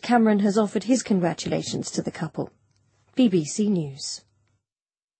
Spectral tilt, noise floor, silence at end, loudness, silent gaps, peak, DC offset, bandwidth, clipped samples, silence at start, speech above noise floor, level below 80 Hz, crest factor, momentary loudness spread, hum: -5.5 dB/octave; under -90 dBFS; 1 s; -24 LUFS; none; -8 dBFS; under 0.1%; 8.8 kHz; under 0.1%; 0 s; over 67 dB; -64 dBFS; 16 dB; 13 LU; none